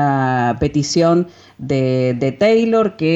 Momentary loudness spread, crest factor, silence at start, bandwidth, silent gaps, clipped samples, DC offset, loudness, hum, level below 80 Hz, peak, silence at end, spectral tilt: 6 LU; 10 dB; 0 s; 8.2 kHz; none; under 0.1%; under 0.1%; -16 LUFS; none; -44 dBFS; -4 dBFS; 0 s; -6 dB/octave